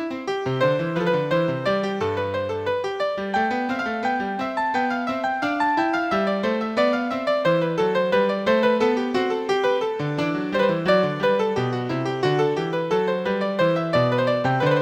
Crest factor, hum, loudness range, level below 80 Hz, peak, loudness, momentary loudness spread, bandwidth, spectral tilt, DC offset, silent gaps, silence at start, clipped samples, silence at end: 16 dB; none; 3 LU; -60 dBFS; -6 dBFS; -22 LUFS; 5 LU; 9.4 kHz; -6.5 dB/octave; under 0.1%; none; 0 s; under 0.1%; 0 s